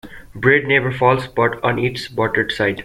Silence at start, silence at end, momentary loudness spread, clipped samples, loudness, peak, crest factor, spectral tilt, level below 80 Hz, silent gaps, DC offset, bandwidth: 0.05 s; 0 s; 7 LU; under 0.1%; -17 LUFS; -2 dBFS; 16 dB; -6.5 dB/octave; -46 dBFS; none; under 0.1%; 15.5 kHz